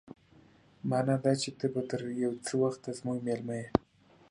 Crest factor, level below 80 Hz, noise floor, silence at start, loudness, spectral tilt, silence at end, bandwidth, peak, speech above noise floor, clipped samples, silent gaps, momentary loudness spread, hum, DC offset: 26 dB; -62 dBFS; -61 dBFS; 0.05 s; -33 LUFS; -6 dB/octave; 0.5 s; 11.5 kHz; -6 dBFS; 29 dB; under 0.1%; none; 7 LU; none; under 0.1%